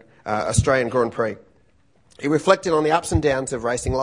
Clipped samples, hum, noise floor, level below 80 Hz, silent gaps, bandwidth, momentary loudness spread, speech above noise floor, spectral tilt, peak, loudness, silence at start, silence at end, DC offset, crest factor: under 0.1%; none; -60 dBFS; -38 dBFS; none; 11 kHz; 9 LU; 40 dB; -5 dB/octave; 0 dBFS; -21 LUFS; 0.25 s; 0 s; under 0.1%; 22 dB